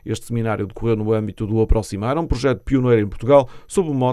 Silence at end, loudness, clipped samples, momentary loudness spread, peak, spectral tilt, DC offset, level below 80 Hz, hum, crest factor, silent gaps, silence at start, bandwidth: 0 s; -20 LUFS; under 0.1%; 8 LU; 0 dBFS; -7.5 dB/octave; under 0.1%; -28 dBFS; none; 18 dB; none; 0.05 s; 13 kHz